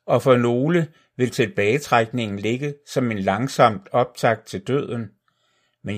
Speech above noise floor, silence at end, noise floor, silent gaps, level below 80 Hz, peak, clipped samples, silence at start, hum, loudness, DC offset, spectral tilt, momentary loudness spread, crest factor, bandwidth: 46 dB; 0 s; -67 dBFS; none; -64 dBFS; 0 dBFS; under 0.1%; 0.05 s; none; -21 LUFS; under 0.1%; -6 dB/octave; 9 LU; 20 dB; 15.5 kHz